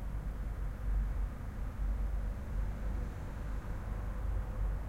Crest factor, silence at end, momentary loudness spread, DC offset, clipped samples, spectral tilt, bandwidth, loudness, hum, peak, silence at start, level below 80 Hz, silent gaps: 12 dB; 0 s; 4 LU; under 0.1%; under 0.1%; -7.5 dB/octave; 7.4 kHz; -41 LUFS; none; -24 dBFS; 0 s; -36 dBFS; none